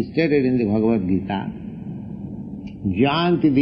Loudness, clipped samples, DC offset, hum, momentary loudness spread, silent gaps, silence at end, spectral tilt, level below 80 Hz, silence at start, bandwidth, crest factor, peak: -20 LUFS; under 0.1%; under 0.1%; none; 15 LU; none; 0 s; -10 dB/octave; -48 dBFS; 0 s; 5.8 kHz; 14 dB; -6 dBFS